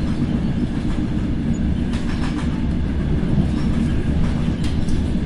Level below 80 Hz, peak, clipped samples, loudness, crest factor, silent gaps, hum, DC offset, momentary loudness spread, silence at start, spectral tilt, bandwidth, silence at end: -24 dBFS; -6 dBFS; under 0.1%; -22 LUFS; 12 dB; none; none; under 0.1%; 3 LU; 0 s; -7.5 dB/octave; 11.5 kHz; 0 s